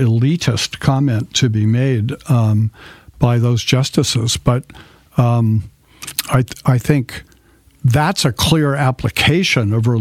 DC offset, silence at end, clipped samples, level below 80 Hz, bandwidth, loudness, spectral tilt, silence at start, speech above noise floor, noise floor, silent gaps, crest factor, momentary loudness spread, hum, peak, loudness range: under 0.1%; 0 s; under 0.1%; -42 dBFS; 16 kHz; -16 LUFS; -5.5 dB/octave; 0 s; 35 dB; -50 dBFS; none; 16 dB; 6 LU; none; 0 dBFS; 2 LU